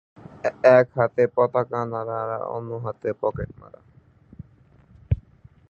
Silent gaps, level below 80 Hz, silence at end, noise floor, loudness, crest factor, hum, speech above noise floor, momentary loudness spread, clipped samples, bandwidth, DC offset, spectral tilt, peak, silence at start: none; -44 dBFS; 0.5 s; -54 dBFS; -23 LUFS; 22 dB; none; 32 dB; 14 LU; under 0.1%; 7 kHz; under 0.1%; -8.5 dB/octave; -2 dBFS; 0.45 s